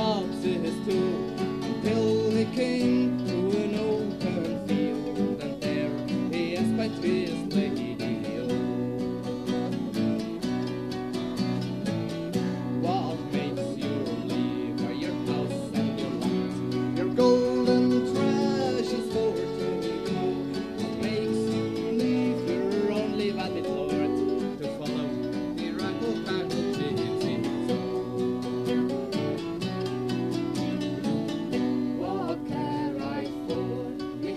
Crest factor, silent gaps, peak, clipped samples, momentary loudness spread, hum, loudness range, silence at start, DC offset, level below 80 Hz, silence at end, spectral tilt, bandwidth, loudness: 18 dB; none; -10 dBFS; under 0.1%; 6 LU; none; 5 LU; 0 s; under 0.1%; -56 dBFS; 0 s; -6.5 dB/octave; 14 kHz; -28 LUFS